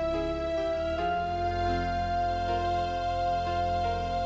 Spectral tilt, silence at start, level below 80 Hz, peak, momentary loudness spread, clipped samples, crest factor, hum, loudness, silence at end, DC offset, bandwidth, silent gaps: -6.5 dB/octave; 0 s; -40 dBFS; -16 dBFS; 1 LU; under 0.1%; 12 dB; none; -29 LUFS; 0 s; under 0.1%; 8 kHz; none